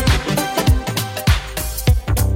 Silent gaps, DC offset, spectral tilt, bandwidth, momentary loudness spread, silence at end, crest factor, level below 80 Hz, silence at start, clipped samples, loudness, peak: none; under 0.1%; -4.5 dB/octave; 17 kHz; 3 LU; 0 s; 14 dB; -22 dBFS; 0 s; under 0.1%; -18 LUFS; -4 dBFS